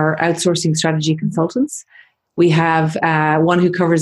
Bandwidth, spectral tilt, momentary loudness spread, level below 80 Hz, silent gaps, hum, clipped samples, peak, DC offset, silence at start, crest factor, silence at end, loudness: 12 kHz; -5.5 dB/octave; 6 LU; -56 dBFS; none; none; under 0.1%; -2 dBFS; under 0.1%; 0 s; 14 dB; 0 s; -16 LUFS